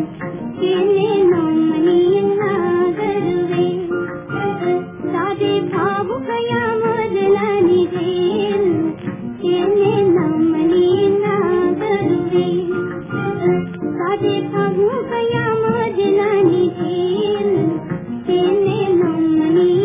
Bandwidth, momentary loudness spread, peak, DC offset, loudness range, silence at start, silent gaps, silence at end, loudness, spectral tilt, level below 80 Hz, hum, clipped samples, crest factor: 3.8 kHz; 8 LU; -4 dBFS; under 0.1%; 3 LU; 0 s; none; 0 s; -17 LUFS; -11.5 dB/octave; -52 dBFS; none; under 0.1%; 12 dB